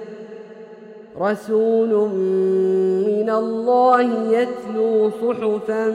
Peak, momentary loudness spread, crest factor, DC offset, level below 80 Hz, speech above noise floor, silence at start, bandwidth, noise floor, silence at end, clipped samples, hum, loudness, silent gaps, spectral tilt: -2 dBFS; 17 LU; 16 dB; under 0.1%; -70 dBFS; 22 dB; 0 s; 10.5 kHz; -40 dBFS; 0 s; under 0.1%; none; -19 LUFS; none; -7.5 dB/octave